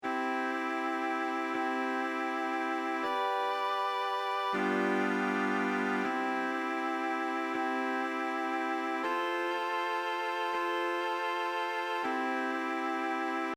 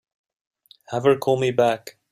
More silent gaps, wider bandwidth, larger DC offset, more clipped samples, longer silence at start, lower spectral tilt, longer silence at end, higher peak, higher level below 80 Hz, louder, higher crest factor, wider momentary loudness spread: neither; about the same, 17 kHz vs 15.5 kHz; neither; neither; second, 0 s vs 0.9 s; second, -4.5 dB/octave vs -6 dB/octave; second, 0 s vs 0.2 s; second, -18 dBFS vs -4 dBFS; second, -84 dBFS vs -64 dBFS; second, -32 LUFS vs -21 LUFS; about the same, 14 dB vs 18 dB; second, 2 LU vs 11 LU